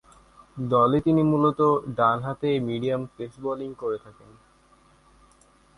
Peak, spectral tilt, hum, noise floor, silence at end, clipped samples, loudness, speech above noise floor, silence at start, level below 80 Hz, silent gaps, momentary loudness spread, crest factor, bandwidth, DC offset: -8 dBFS; -8.5 dB/octave; none; -58 dBFS; 1.65 s; under 0.1%; -24 LUFS; 34 dB; 0.55 s; -56 dBFS; none; 14 LU; 18 dB; 11 kHz; under 0.1%